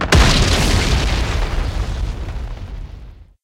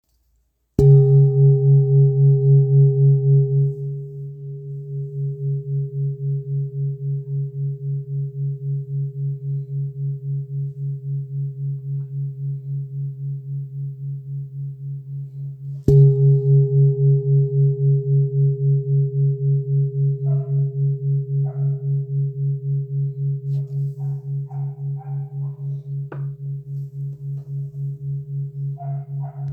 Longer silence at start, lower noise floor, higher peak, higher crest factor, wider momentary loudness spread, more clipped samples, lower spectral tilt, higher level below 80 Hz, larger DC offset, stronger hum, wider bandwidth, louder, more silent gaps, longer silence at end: second, 0 s vs 0.8 s; second, -37 dBFS vs -66 dBFS; about the same, -2 dBFS vs -2 dBFS; about the same, 16 dB vs 18 dB; first, 19 LU vs 16 LU; neither; second, -4 dB/octave vs -13 dB/octave; first, -20 dBFS vs -48 dBFS; neither; neither; first, 16 kHz vs 0.9 kHz; first, -17 LUFS vs -21 LUFS; neither; first, 0.2 s vs 0 s